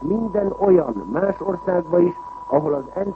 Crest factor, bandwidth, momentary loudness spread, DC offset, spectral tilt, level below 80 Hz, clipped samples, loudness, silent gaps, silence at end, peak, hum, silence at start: 16 dB; 3.1 kHz; 7 LU; under 0.1%; -10.5 dB/octave; -48 dBFS; under 0.1%; -20 LUFS; none; 0 s; -4 dBFS; none; 0 s